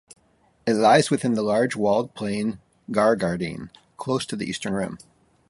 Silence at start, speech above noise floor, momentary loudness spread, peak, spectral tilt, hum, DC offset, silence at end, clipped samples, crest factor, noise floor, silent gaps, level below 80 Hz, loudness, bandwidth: 0.65 s; 40 dB; 16 LU; -4 dBFS; -5.5 dB/octave; none; under 0.1%; 0.5 s; under 0.1%; 20 dB; -62 dBFS; none; -58 dBFS; -23 LUFS; 11.5 kHz